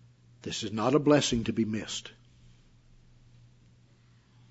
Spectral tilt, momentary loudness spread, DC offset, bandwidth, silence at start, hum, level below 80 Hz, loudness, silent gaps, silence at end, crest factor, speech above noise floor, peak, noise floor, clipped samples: -5 dB/octave; 15 LU; under 0.1%; 8 kHz; 0.45 s; none; -56 dBFS; -28 LUFS; none; 2.4 s; 22 dB; 33 dB; -10 dBFS; -61 dBFS; under 0.1%